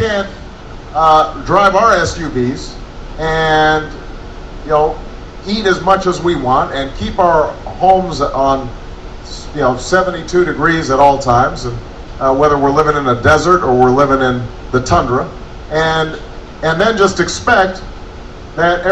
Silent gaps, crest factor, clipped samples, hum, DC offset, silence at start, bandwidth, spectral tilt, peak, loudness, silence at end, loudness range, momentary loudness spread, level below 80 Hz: none; 14 dB; under 0.1%; none; under 0.1%; 0 s; 9.6 kHz; -5 dB/octave; 0 dBFS; -13 LUFS; 0 s; 4 LU; 20 LU; -30 dBFS